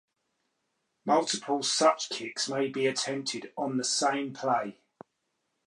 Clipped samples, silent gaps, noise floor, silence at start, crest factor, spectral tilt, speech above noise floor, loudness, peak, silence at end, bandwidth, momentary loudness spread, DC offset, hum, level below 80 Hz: under 0.1%; none; -80 dBFS; 1.05 s; 22 dB; -2.5 dB/octave; 51 dB; -29 LUFS; -10 dBFS; 0.95 s; 11.5 kHz; 9 LU; under 0.1%; none; -84 dBFS